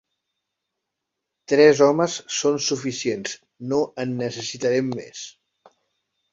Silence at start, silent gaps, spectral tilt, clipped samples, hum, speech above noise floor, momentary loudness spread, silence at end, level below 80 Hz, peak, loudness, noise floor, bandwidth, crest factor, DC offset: 1.5 s; none; -4 dB/octave; under 0.1%; none; 61 dB; 17 LU; 1 s; -66 dBFS; -2 dBFS; -21 LUFS; -82 dBFS; 7.8 kHz; 20 dB; under 0.1%